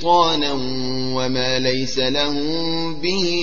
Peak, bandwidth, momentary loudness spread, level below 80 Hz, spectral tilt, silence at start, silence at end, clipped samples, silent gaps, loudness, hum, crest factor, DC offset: -4 dBFS; 7.2 kHz; 6 LU; -46 dBFS; -4.5 dB/octave; 0 s; 0 s; under 0.1%; none; -20 LUFS; none; 16 dB; 6%